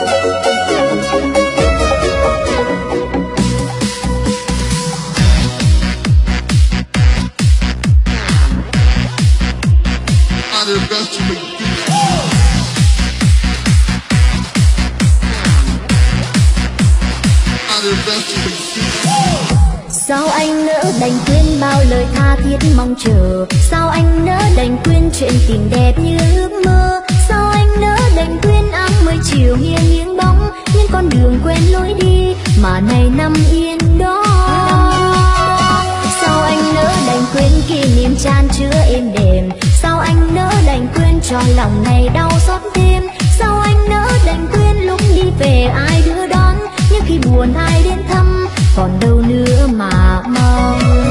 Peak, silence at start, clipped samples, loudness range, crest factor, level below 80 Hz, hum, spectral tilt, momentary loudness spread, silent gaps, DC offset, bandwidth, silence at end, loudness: 0 dBFS; 0 s; under 0.1%; 2 LU; 10 dB; -14 dBFS; none; -5.5 dB/octave; 3 LU; none; under 0.1%; 14 kHz; 0 s; -12 LUFS